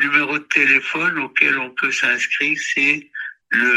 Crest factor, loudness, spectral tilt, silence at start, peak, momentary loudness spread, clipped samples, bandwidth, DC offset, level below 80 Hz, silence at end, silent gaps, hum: 18 dB; -17 LUFS; -2.5 dB/octave; 0 s; 0 dBFS; 6 LU; under 0.1%; 12.5 kHz; under 0.1%; -70 dBFS; 0 s; none; none